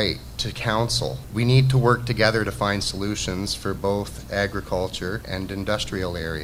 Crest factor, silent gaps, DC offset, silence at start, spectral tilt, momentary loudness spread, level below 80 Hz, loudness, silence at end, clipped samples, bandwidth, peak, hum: 22 dB; none; under 0.1%; 0 s; -5 dB/octave; 10 LU; -40 dBFS; -24 LUFS; 0 s; under 0.1%; 16 kHz; -2 dBFS; none